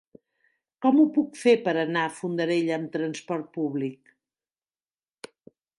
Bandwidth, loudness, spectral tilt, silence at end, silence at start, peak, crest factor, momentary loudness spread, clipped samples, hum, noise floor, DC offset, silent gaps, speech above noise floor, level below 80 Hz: 11.5 kHz; -25 LUFS; -6 dB/octave; 1.85 s; 0.8 s; -8 dBFS; 18 dB; 12 LU; under 0.1%; none; under -90 dBFS; under 0.1%; none; over 66 dB; -80 dBFS